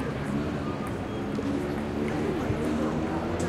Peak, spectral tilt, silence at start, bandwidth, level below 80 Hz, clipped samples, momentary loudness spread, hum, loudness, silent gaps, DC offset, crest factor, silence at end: -16 dBFS; -7 dB/octave; 0 s; 15 kHz; -44 dBFS; under 0.1%; 4 LU; none; -30 LUFS; none; under 0.1%; 14 dB; 0 s